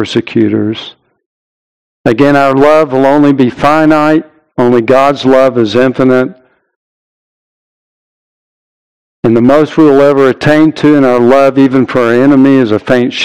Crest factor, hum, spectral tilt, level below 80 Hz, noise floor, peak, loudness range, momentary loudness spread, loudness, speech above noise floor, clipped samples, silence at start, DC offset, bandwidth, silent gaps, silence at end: 8 dB; none; -7 dB/octave; -44 dBFS; under -90 dBFS; 0 dBFS; 8 LU; 7 LU; -8 LUFS; over 83 dB; 5%; 0 s; 2%; 11 kHz; 1.26-2.04 s, 6.76-9.23 s; 0 s